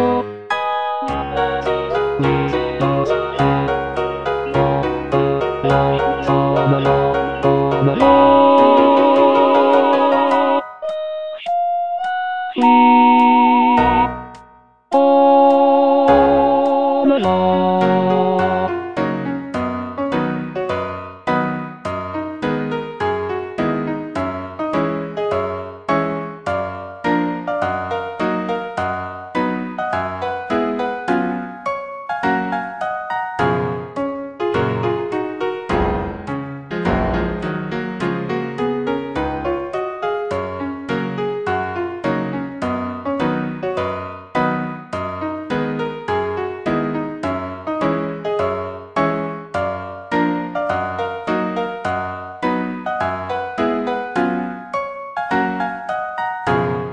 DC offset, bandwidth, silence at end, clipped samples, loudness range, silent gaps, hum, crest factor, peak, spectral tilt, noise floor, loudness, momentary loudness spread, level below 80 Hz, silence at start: under 0.1%; 9.2 kHz; 0 s; under 0.1%; 9 LU; none; none; 18 dB; 0 dBFS; -7.5 dB/octave; -47 dBFS; -18 LUFS; 12 LU; -42 dBFS; 0 s